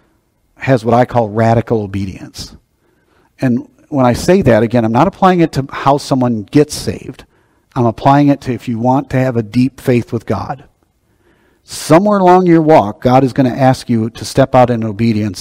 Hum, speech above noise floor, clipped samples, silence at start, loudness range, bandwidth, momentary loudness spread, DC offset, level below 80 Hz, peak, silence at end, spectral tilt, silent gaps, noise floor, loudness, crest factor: none; 46 dB; 0.8%; 0.6 s; 5 LU; 16 kHz; 14 LU; under 0.1%; -40 dBFS; 0 dBFS; 0 s; -7 dB/octave; none; -58 dBFS; -12 LUFS; 12 dB